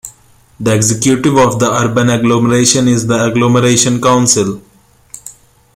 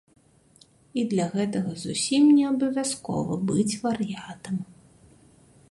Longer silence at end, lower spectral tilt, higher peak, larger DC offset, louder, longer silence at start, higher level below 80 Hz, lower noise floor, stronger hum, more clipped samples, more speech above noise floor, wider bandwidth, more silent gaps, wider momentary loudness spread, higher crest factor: second, 0.45 s vs 1.05 s; about the same, -4.5 dB/octave vs -5 dB/octave; first, 0 dBFS vs -10 dBFS; neither; first, -11 LUFS vs -25 LUFS; second, 0.05 s vs 0.95 s; first, -44 dBFS vs -62 dBFS; second, -45 dBFS vs -58 dBFS; neither; neither; about the same, 35 dB vs 33 dB; first, 16 kHz vs 11.5 kHz; neither; about the same, 14 LU vs 15 LU; about the same, 12 dB vs 16 dB